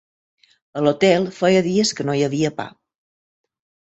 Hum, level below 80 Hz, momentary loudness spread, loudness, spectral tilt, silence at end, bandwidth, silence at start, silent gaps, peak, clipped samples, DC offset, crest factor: none; -60 dBFS; 14 LU; -19 LUFS; -5 dB/octave; 1.2 s; 8.2 kHz; 0.75 s; none; -2 dBFS; under 0.1%; under 0.1%; 18 dB